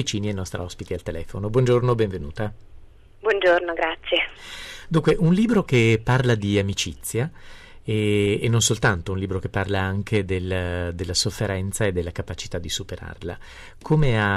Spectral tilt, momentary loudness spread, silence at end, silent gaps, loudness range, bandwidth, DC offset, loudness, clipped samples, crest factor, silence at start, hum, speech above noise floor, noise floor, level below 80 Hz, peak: -5 dB/octave; 13 LU; 0 s; none; 5 LU; 14.5 kHz; under 0.1%; -23 LUFS; under 0.1%; 16 dB; 0 s; none; 22 dB; -45 dBFS; -40 dBFS; -8 dBFS